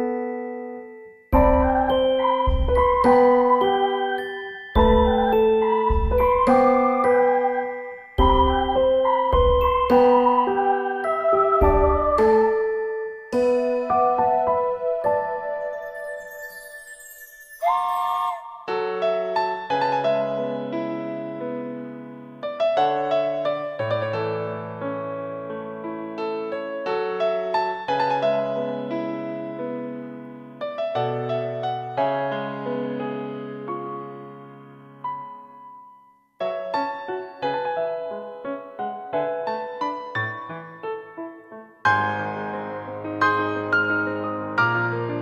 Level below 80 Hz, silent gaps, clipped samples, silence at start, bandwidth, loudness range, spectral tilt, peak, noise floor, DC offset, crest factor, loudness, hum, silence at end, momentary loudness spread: -34 dBFS; none; under 0.1%; 0 s; 14.5 kHz; 10 LU; -7 dB/octave; -6 dBFS; -53 dBFS; under 0.1%; 18 dB; -22 LUFS; none; 0 s; 16 LU